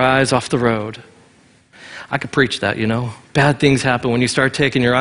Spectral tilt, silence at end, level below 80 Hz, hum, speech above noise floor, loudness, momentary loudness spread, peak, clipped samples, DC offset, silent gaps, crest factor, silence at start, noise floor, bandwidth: -5 dB/octave; 0 s; -46 dBFS; none; 35 dB; -17 LUFS; 11 LU; 0 dBFS; under 0.1%; under 0.1%; none; 18 dB; 0 s; -51 dBFS; 11 kHz